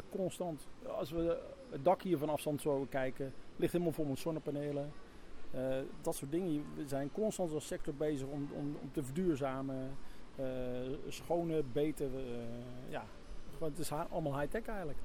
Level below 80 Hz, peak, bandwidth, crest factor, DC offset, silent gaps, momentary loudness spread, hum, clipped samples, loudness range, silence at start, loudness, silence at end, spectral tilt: -54 dBFS; -20 dBFS; 18 kHz; 18 dB; under 0.1%; none; 11 LU; none; under 0.1%; 4 LU; 0 s; -39 LUFS; 0 s; -6.5 dB/octave